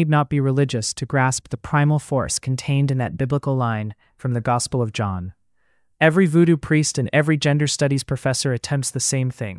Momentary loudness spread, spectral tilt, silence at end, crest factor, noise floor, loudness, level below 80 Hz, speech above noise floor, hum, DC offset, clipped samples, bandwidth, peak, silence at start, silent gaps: 8 LU; -5 dB/octave; 0 s; 18 dB; -69 dBFS; -20 LUFS; -50 dBFS; 49 dB; none; under 0.1%; under 0.1%; 12 kHz; -4 dBFS; 0 s; none